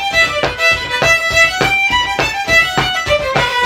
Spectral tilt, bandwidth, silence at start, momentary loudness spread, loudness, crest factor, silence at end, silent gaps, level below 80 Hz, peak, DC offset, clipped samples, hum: -2.5 dB/octave; over 20 kHz; 0 s; 4 LU; -12 LUFS; 14 dB; 0 s; none; -34 dBFS; 0 dBFS; under 0.1%; under 0.1%; none